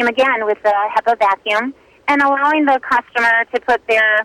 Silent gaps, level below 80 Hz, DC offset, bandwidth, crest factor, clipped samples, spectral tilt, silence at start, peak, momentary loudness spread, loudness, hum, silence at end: none; -56 dBFS; under 0.1%; 14 kHz; 10 dB; under 0.1%; -3 dB/octave; 0 s; -6 dBFS; 5 LU; -15 LUFS; none; 0 s